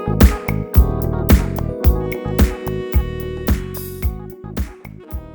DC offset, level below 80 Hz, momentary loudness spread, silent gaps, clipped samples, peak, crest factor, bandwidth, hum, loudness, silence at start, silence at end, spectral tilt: under 0.1%; -20 dBFS; 14 LU; none; under 0.1%; 0 dBFS; 16 dB; over 20 kHz; none; -19 LUFS; 0 s; 0 s; -7 dB/octave